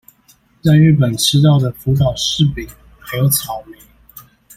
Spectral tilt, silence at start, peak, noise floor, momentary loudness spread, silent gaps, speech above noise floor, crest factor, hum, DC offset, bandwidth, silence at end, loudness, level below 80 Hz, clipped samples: -5.5 dB/octave; 0.65 s; -2 dBFS; -53 dBFS; 16 LU; none; 39 dB; 14 dB; none; under 0.1%; 16 kHz; 0.35 s; -14 LUFS; -40 dBFS; under 0.1%